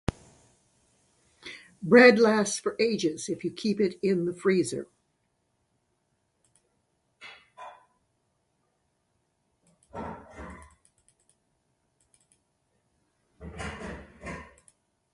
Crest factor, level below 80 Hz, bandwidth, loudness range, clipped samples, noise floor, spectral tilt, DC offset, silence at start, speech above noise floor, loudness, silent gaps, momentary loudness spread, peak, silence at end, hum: 26 dB; -56 dBFS; 11.5 kHz; 24 LU; under 0.1%; -75 dBFS; -4.5 dB/octave; under 0.1%; 1.45 s; 52 dB; -24 LUFS; none; 29 LU; -4 dBFS; 0.7 s; none